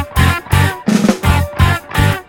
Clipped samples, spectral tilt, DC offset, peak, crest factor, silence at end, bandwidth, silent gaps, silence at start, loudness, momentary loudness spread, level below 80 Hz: under 0.1%; -5.5 dB/octave; under 0.1%; 0 dBFS; 12 dB; 0.05 s; 17.5 kHz; none; 0 s; -14 LUFS; 2 LU; -22 dBFS